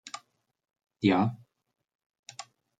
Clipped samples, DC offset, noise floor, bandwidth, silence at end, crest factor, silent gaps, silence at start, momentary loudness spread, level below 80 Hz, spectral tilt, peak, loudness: under 0.1%; under 0.1%; -60 dBFS; 9.4 kHz; 0.4 s; 24 dB; 1.95-1.99 s, 2.06-2.10 s, 2.19-2.23 s; 0.05 s; 21 LU; -72 dBFS; -6 dB/octave; -10 dBFS; -27 LUFS